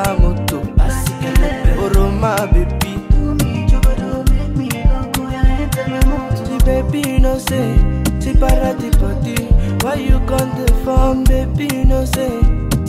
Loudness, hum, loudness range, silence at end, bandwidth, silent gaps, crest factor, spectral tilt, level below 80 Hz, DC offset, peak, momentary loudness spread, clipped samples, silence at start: -17 LUFS; none; 1 LU; 0 s; 15.5 kHz; none; 12 dB; -6 dB/octave; -16 dBFS; under 0.1%; -2 dBFS; 3 LU; under 0.1%; 0 s